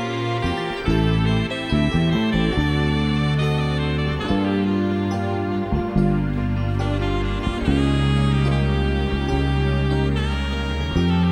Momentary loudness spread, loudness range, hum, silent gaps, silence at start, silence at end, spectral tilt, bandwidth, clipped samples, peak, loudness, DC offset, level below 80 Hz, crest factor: 4 LU; 2 LU; none; none; 0 s; 0 s; -7 dB/octave; 10.5 kHz; under 0.1%; -6 dBFS; -21 LUFS; under 0.1%; -28 dBFS; 14 dB